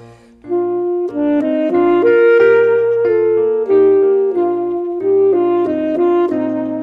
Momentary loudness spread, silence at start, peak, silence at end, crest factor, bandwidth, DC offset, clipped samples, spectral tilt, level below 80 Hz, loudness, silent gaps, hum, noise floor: 8 LU; 0 s; -2 dBFS; 0 s; 12 dB; 5 kHz; under 0.1%; under 0.1%; -8.5 dB/octave; -58 dBFS; -14 LUFS; none; none; -37 dBFS